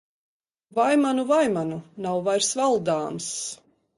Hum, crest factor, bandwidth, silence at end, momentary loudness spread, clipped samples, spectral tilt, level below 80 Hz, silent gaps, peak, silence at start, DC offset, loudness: none; 16 dB; 11.5 kHz; 0.45 s; 11 LU; under 0.1%; -4 dB/octave; -68 dBFS; none; -10 dBFS; 0.75 s; under 0.1%; -24 LUFS